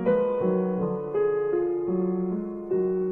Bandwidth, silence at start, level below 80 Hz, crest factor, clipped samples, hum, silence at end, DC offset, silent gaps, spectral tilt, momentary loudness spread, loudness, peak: 3.2 kHz; 0 s; -58 dBFS; 12 dB; under 0.1%; none; 0 s; under 0.1%; none; -11.5 dB/octave; 5 LU; -26 LUFS; -12 dBFS